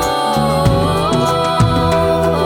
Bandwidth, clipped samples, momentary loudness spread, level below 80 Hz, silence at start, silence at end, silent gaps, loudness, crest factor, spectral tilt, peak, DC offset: 18.5 kHz; under 0.1%; 1 LU; -30 dBFS; 0 s; 0 s; none; -14 LUFS; 12 dB; -6 dB/octave; 0 dBFS; under 0.1%